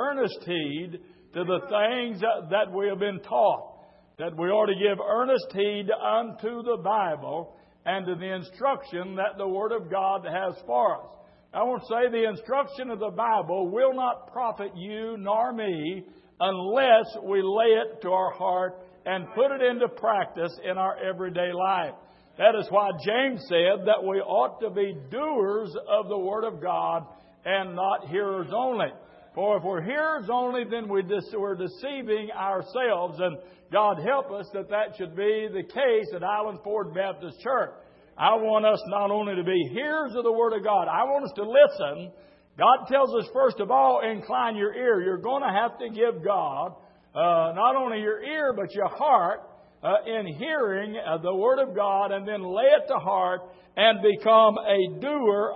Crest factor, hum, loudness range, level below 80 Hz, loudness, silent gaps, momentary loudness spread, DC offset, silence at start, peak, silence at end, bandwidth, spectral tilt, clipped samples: 20 dB; none; 5 LU; -72 dBFS; -26 LUFS; none; 11 LU; under 0.1%; 0 s; -6 dBFS; 0 s; 5.8 kHz; -9 dB/octave; under 0.1%